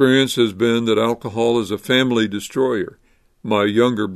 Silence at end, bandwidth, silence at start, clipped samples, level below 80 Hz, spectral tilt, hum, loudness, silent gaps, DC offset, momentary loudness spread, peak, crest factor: 0 s; 13.5 kHz; 0 s; under 0.1%; -58 dBFS; -5 dB/octave; none; -18 LUFS; none; under 0.1%; 6 LU; 0 dBFS; 18 dB